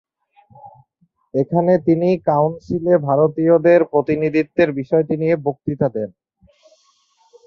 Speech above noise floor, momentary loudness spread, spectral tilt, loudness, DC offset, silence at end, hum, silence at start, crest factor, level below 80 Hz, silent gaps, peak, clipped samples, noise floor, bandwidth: 47 dB; 9 LU; -10 dB/octave; -17 LUFS; under 0.1%; 1.4 s; none; 0.65 s; 16 dB; -56 dBFS; none; -2 dBFS; under 0.1%; -63 dBFS; 6.4 kHz